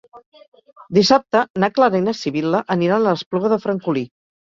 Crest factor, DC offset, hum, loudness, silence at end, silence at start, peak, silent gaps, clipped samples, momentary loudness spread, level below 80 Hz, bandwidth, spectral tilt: 18 dB; under 0.1%; none; -18 LUFS; 0.55 s; 0.15 s; -2 dBFS; 0.26-0.32 s, 0.48-0.52 s, 1.50-1.54 s, 3.26-3.31 s; under 0.1%; 7 LU; -60 dBFS; 7.6 kHz; -5.5 dB/octave